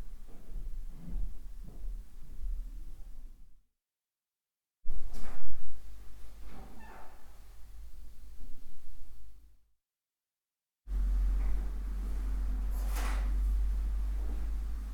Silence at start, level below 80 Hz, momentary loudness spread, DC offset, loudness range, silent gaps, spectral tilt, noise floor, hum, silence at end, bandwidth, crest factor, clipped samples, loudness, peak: 0 s; -36 dBFS; 22 LU; under 0.1%; 19 LU; none; -6 dB/octave; under -90 dBFS; none; 0 s; 14.5 kHz; 18 dB; under 0.1%; -39 LUFS; -10 dBFS